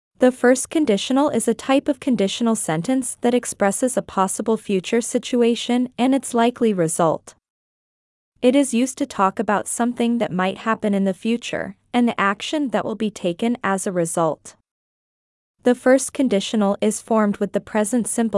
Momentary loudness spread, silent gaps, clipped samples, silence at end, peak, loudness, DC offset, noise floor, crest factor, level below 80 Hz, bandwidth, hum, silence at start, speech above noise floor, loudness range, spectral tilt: 5 LU; 7.50-8.32 s, 14.71-15.54 s; under 0.1%; 0 s; -4 dBFS; -20 LUFS; under 0.1%; under -90 dBFS; 16 dB; -62 dBFS; 12 kHz; none; 0.2 s; over 70 dB; 2 LU; -4.5 dB/octave